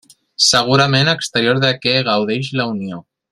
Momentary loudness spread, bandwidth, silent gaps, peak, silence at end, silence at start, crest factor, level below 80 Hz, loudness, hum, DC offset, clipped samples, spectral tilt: 14 LU; 13 kHz; none; 0 dBFS; 0.3 s; 0.4 s; 16 dB; -54 dBFS; -15 LUFS; none; under 0.1%; under 0.1%; -3.5 dB/octave